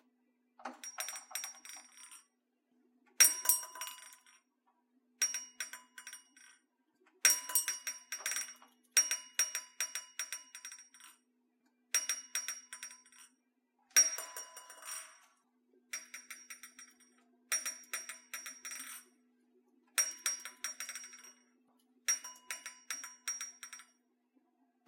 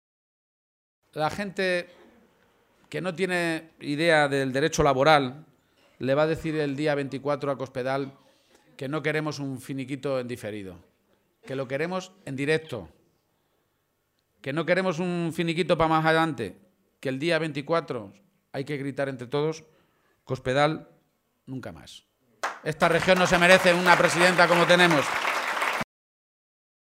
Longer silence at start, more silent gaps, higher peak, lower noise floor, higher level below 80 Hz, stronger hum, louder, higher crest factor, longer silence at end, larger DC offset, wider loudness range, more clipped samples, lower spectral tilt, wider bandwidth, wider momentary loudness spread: second, 0.6 s vs 1.15 s; neither; second, -8 dBFS vs -2 dBFS; first, -80 dBFS vs -73 dBFS; second, under -90 dBFS vs -58 dBFS; neither; second, -35 LUFS vs -24 LUFS; first, 32 dB vs 24 dB; about the same, 1.05 s vs 0.95 s; neither; second, 10 LU vs 13 LU; neither; second, 6 dB/octave vs -4.5 dB/octave; about the same, 16.5 kHz vs 16 kHz; first, 22 LU vs 18 LU